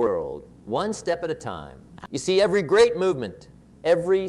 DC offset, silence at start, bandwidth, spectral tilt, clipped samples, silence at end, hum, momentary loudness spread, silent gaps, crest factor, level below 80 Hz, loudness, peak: under 0.1%; 0 s; 11.5 kHz; -5 dB/octave; under 0.1%; 0 s; none; 18 LU; none; 20 dB; -54 dBFS; -23 LUFS; -4 dBFS